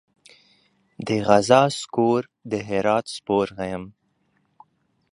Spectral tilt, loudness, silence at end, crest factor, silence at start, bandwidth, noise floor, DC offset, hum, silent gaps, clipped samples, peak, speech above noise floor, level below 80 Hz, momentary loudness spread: -5.5 dB/octave; -22 LUFS; 1.25 s; 22 dB; 1 s; 11.5 kHz; -68 dBFS; under 0.1%; none; none; under 0.1%; 0 dBFS; 47 dB; -58 dBFS; 14 LU